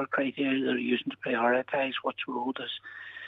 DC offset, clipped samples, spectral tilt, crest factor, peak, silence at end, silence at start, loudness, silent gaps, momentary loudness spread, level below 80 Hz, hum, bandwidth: under 0.1%; under 0.1%; -7 dB/octave; 16 dB; -14 dBFS; 0 s; 0 s; -30 LUFS; none; 10 LU; -80 dBFS; none; 4.5 kHz